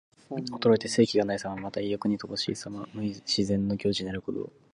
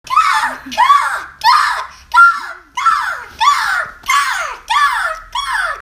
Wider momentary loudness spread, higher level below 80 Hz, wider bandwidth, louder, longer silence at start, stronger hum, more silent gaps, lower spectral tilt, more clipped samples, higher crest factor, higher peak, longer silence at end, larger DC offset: about the same, 12 LU vs 11 LU; second, -58 dBFS vs -48 dBFS; second, 11.5 kHz vs 16 kHz; second, -29 LUFS vs -13 LUFS; first, 0.3 s vs 0.05 s; neither; neither; first, -5 dB/octave vs 0.5 dB/octave; neither; first, 20 dB vs 14 dB; second, -8 dBFS vs 0 dBFS; first, 0.25 s vs 0 s; neither